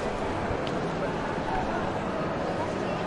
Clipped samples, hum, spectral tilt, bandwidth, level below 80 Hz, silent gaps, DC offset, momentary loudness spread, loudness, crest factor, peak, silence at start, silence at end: under 0.1%; none; -6 dB/octave; 11.5 kHz; -44 dBFS; none; under 0.1%; 1 LU; -30 LUFS; 14 dB; -16 dBFS; 0 s; 0 s